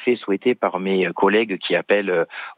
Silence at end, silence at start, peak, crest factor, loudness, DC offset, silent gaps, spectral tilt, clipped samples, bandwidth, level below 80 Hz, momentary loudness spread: 0.05 s; 0 s; -4 dBFS; 16 dB; -20 LUFS; under 0.1%; none; -8 dB/octave; under 0.1%; 4.9 kHz; -74 dBFS; 4 LU